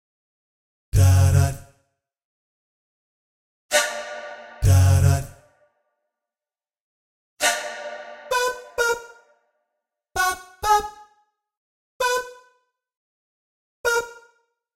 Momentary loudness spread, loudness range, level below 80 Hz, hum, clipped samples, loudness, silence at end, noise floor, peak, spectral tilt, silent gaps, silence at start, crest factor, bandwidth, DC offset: 19 LU; 6 LU; -40 dBFS; none; under 0.1%; -21 LUFS; 0.6 s; under -90 dBFS; -4 dBFS; -4.5 dB/octave; 2.25-3.69 s, 6.81-7.37 s, 11.57-12.00 s, 12.97-13.84 s; 0.95 s; 20 dB; 16 kHz; under 0.1%